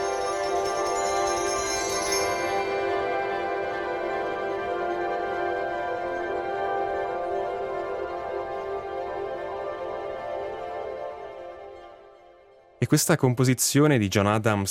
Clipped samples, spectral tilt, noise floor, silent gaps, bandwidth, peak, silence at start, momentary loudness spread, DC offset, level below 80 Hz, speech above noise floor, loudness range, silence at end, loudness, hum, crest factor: under 0.1%; -4.5 dB/octave; -54 dBFS; none; 16.5 kHz; -6 dBFS; 0 s; 12 LU; under 0.1%; -56 dBFS; 32 dB; 9 LU; 0 s; -27 LUFS; none; 20 dB